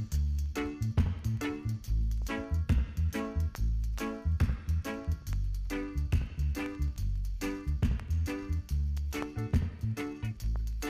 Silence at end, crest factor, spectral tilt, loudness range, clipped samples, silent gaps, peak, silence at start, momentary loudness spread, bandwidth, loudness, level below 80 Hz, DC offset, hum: 0 s; 16 dB; -7 dB/octave; 1 LU; under 0.1%; none; -16 dBFS; 0 s; 5 LU; 15.5 kHz; -34 LUFS; -34 dBFS; under 0.1%; none